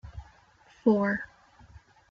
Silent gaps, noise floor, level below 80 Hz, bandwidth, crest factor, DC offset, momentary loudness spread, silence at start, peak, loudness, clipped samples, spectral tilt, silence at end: none; -59 dBFS; -54 dBFS; 6.8 kHz; 22 dB; under 0.1%; 23 LU; 0.05 s; -10 dBFS; -27 LUFS; under 0.1%; -8.5 dB/octave; 0.85 s